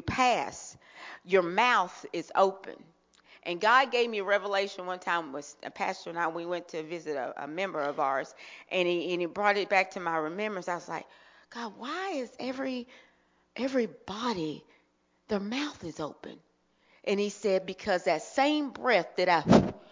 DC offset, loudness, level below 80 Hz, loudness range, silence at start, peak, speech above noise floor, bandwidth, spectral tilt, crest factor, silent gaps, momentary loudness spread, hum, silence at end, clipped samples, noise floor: under 0.1%; -29 LUFS; -60 dBFS; 8 LU; 0.05 s; -6 dBFS; 41 dB; 7.6 kHz; -5 dB/octave; 24 dB; none; 16 LU; none; 0.05 s; under 0.1%; -71 dBFS